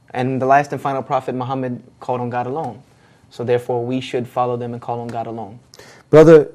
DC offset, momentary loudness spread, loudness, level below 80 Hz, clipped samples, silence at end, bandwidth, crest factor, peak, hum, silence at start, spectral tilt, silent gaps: under 0.1%; 15 LU; -18 LUFS; -52 dBFS; under 0.1%; 0.05 s; 11.5 kHz; 18 dB; 0 dBFS; none; 0.15 s; -7.5 dB/octave; none